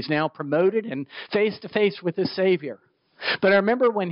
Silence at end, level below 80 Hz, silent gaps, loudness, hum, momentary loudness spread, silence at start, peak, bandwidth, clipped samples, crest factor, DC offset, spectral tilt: 0 s; -72 dBFS; none; -23 LUFS; none; 10 LU; 0 s; -8 dBFS; 5.6 kHz; under 0.1%; 16 dB; under 0.1%; -4 dB/octave